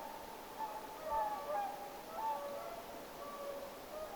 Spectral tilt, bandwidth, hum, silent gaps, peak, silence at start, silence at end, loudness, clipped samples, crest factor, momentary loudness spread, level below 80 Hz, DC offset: -3 dB/octave; over 20 kHz; none; none; -28 dBFS; 0 s; 0 s; -44 LUFS; under 0.1%; 16 dB; 9 LU; -68 dBFS; under 0.1%